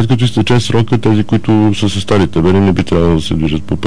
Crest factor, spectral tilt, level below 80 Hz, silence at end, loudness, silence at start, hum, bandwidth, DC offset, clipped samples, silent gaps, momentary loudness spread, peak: 10 dB; -7 dB/octave; -30 dBFS; 0 s; -12 LUFS; 0 s; none; 10.5 kHz; 8%; under 0.1%; none; 4 LU; -2 dBFS